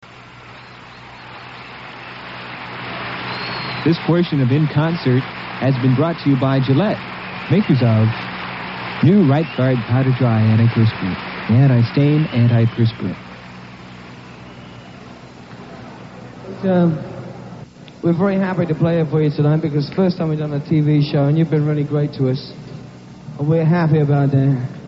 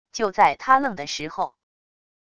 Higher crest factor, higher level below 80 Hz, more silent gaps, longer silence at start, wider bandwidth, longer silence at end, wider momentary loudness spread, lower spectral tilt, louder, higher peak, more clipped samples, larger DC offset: about the same, 16 dB vs 20 dB; first, -52 dBFS vs -60 dBFS; neither; about the same, 0.05 s vs 0.15 s; second, 6 kHz vs 10 kHz; second, 0 s vs 0.8 s; first, 22 LU vs 11 LU; first, -7 dB/octave vs -3 dB/octave; first, -17 LUFS vs -22 LUFS; about the same, -2 dBFS vs -2 dBFS; neither; neither